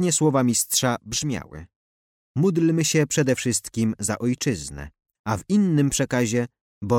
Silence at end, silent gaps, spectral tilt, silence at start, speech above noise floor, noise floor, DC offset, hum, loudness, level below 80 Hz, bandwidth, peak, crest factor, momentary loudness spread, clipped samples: 0 s; 1.76-2.35 s, 5.19-5.24 s, 6.61-6.81 s; -4.5 dB/octave; 0 s; over 68 dB; under -90 dBFS; under 0.1%; none; -22 LUFS; -50 dBFS; 16.5 kHz; -8 dBFS; 14 dB; 14 LU; under 0.1%